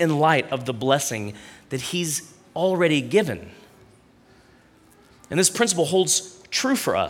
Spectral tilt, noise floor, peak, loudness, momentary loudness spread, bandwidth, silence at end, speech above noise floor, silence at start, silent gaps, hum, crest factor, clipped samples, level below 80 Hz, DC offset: -3.5 dB/octave; -54 dBFS; -4 dBFS; -22 LUFS; 12 LU; 17.5 kHz; 0 s; 32 dB; 0 s; none; none; 18 dB; under 0.1%; -62 dBFS; under 0.1%